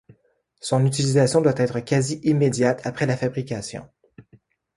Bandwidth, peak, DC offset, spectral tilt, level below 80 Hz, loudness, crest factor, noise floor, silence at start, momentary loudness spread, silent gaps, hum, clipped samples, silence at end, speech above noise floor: 11.5 kHz; -6 dBFS; under 0.1%; -6 dB/octave; -58 dBFS; -22 LUFS; 18 dB; -64 dBFS; 0.65 s; 12 LU; none; none; under 0.1%; 0.55 s; 43 dB